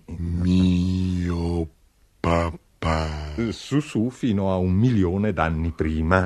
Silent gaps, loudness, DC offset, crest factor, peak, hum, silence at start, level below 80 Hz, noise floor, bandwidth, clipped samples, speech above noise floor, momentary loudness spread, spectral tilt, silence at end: none; -23 LUFS; under 0.1%; 22 dB; -2 dBFS; none; 0.1 s; -36 dBFS; -58 dBFS; 11 kHz; under 0.1%; 37 dB; 9 LU; -7.5 dB/octave; 0 s